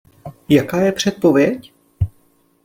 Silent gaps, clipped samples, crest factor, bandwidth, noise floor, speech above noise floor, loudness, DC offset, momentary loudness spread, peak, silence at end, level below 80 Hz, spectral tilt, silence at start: none; under 0.1%; 18 dB; 16.5 kHz; -57 dBFS; 41 dB; -17 LUFS; under 0.1%; 12 LU; 0 dBFS; 0.55 s; -42 dBFS; -6 dB/octave; 0.25 s